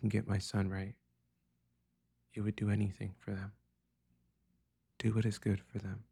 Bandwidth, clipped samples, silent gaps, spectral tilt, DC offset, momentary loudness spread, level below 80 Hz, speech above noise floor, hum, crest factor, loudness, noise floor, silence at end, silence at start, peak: 11.5 kHz; under 0.1%; none; -7 dB/octave; under 0.1%; 10 LU; -64 dBFS; 43 dB; 60 Hz at -65 dBFS; 18 dB; -38 LUFS; -80 dBFS; 0.1 s; 0 s; -22 dBFS